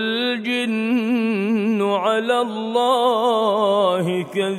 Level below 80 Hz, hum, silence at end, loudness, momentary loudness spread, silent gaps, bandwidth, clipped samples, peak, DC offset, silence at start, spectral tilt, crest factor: -74 dBFS; none; 0 s; -19 LUFS; 4 LU; none; 15 kHz; under 0.1%; -6 dBFS; under 0.1%; 0 s; -5.5 dB/octave; 14 dB